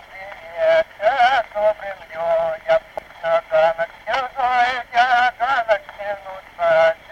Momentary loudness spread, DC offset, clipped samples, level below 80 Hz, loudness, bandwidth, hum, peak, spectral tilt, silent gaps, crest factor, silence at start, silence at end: 14 LU; under 0.1%; under 0.1%; -54 dBFS; -19 LUFS; 8.6 kHz; none; -4 dBFS; -3 dB/octave; none; 16 dB; 0.1 s; 0.15 s